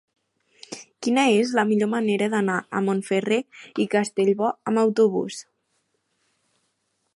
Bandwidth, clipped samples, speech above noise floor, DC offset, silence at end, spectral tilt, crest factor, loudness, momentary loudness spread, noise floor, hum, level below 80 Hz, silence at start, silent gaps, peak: 11.5 kHz; under 0.1%; 51 dB; under 0.1%; 1.75 s; -5 dB/octave; 18 dB; -22 LUFS; 14 LU; -73 dBFS; none; -74 dBFS; 0.7 s; none; -6 dBFS